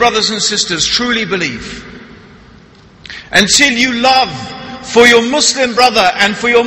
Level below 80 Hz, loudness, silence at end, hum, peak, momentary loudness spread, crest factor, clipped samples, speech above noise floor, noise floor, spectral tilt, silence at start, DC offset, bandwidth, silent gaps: -42 dBFS; -10 LUFS; 0 s; none; 0 dBFS; 19 LU; 12 dB; 0.2%; 29 dB; -40 dBFS; -2 dB/octave; 0 s; under 0.1%; 16 kHz; none